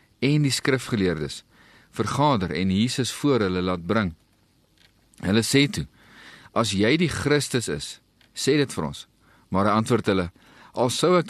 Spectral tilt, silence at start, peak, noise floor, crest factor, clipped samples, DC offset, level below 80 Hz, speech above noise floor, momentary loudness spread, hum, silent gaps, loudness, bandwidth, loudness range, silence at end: -5 dB/octave; 0.2 s; -6 dBFS; -62 dBFS; 18 dB; under 0.1%; under 0.1%; -52 dBFS; 40 dB; 13 LU; none; none; -23 LUFS; 13 kHz; 2 LU; 0 s